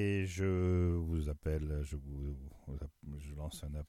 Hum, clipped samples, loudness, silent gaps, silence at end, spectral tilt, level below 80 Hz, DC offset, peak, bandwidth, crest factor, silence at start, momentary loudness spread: none; under 0.1%; -38 LUFS; none; 0.05 s; -7.5 dB/octave; -44 dBFS; under 0.1%; -22 dBFS; 13.5 kHz; 14 dB; 0 s; 15 LU